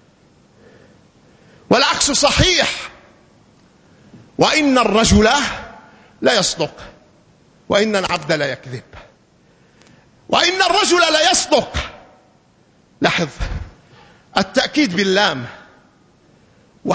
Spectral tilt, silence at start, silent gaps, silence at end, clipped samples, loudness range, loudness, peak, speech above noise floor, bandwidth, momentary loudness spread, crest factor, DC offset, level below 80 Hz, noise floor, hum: -3 dB/octave; 1.7 s; none; 0 s; under 0.1%; 5 LU; -15 LUFS; 0 dBFS; 38 dB; 8 kHz; 17 LU; 18 dB; under 0.1%; -36 dBFS; -54 dBFS; none